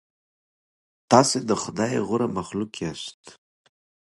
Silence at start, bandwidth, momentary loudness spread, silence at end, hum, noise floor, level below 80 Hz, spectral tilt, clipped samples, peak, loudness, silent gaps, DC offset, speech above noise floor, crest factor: 1.1 s; 11.5 kHz; 14 LU; 0.85 s; none; under -90 dBFS; -60 dBFS; -4.5 dB/octave; under 0.1%; 0 dBFS; -23 LUFS; 3.14-3.24 s; under 0.1%; over 67 dB; 26 dB